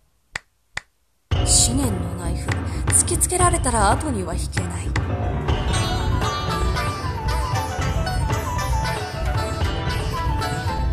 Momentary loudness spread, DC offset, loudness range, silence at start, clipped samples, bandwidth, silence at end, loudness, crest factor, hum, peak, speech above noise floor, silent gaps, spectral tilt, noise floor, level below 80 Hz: 10 LU; under 0.1%; 5 LU; 0.35 s; under 0.1%; 14 kHz; 0 s; -22 LUFS; 18 dB; none; -2 dBFS; 42 dB; none; -4 dB/octave; -62 dBFS; -28 dBFS